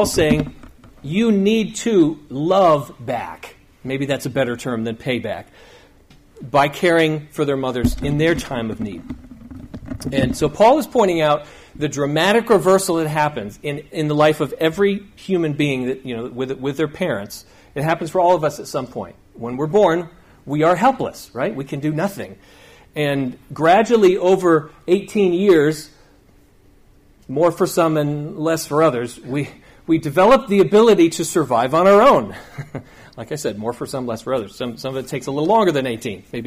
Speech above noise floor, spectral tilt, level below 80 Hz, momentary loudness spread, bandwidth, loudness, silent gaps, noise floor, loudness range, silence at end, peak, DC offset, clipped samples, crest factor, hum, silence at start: 33 dB; -5.5 dB/octave; -44 dBFS; 16 LU; 15.5 kHz; -18 LUFS; none; -51 dBFS; 6 LU; 0 s; -4 dBFS; under 0.1%; under 0.1%; 14 dB; none; 0 s